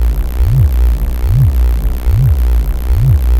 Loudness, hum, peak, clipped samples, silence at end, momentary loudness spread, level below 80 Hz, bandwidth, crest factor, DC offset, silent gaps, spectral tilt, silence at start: -13 LUFS; none; 0 dBFS; under 0.1%; 0 s; 5 LU; -12 dBFS; 16 kHz; 10 dB; under 0.1%; none; -8 dB/octave; 0 s